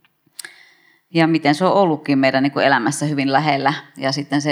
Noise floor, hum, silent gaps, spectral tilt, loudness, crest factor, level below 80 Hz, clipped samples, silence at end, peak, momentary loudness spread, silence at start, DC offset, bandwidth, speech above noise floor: -53 dBFS; none; none; -5 dB/octave; -17 LUFS; 18 dB; -74 dBFS; under 0.1%; 0 s; 0 dBFS; 12 LU; 1.15 s; under 0.1%; 14.5 kHz; 36 dB